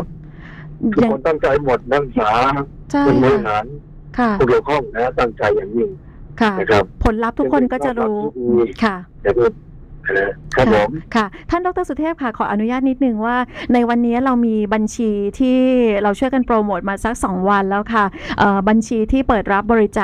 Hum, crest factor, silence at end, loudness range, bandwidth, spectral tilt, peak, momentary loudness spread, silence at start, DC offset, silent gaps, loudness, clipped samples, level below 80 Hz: none; 16 dB; 0 s; 2 LU; 11.5 kHz; -6.5 dB/octave; 0 dBFS; 7 LU; 0 s; under 0.1%; none; -17 LUFS; under 0.1%; -34 dBFS